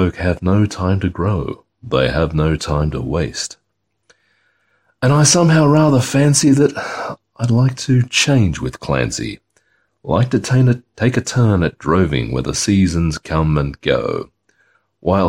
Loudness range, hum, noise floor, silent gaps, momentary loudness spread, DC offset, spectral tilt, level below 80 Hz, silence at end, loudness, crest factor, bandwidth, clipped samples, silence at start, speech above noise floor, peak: 6 LU; none; -71 dBFS; none; 13 LU; under 0.1%; -5.5 dB/octave; -34 dBFS; 0 s; -16 LUFS; 16 dB; 16 kHz; under 0.1%; 0 s; 56 dB; 0 dBFS